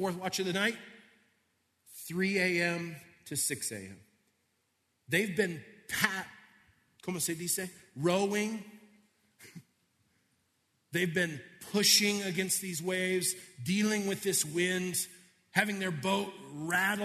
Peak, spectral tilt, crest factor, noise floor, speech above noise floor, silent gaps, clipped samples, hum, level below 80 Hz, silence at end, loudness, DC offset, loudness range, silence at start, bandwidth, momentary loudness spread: -10 dBFS; -3 dB/octave; 24 dB; -77 dBFS; 45 dB; none; under 0.1%; none; -76 dBFS; 0 s; -31 LUFS; under 0.1%; 7 LU; 0 s; 14 kHz; 14 LU